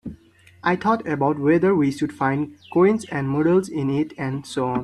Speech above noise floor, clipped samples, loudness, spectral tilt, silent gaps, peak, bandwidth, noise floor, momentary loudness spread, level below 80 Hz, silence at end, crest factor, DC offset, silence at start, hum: 30 dB; under 0.1%; -21 LUFS; -7.5 dB/octave; none; -6 dBFS; 12 kHz; -51 dBFS; 8 LU; -56 dBFS; 0 s; 16 dB; under 0.1%; 0.05 s; none